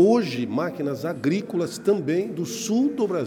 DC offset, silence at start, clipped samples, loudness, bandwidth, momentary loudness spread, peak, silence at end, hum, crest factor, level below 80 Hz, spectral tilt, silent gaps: under 0.1%; 0 s; under 0.1%; -24 LUFS; 18 kHz; 6 LU; -8 dBFS; 0 s; none; 16 dB; -68 dBFS; -6 dB/octave; none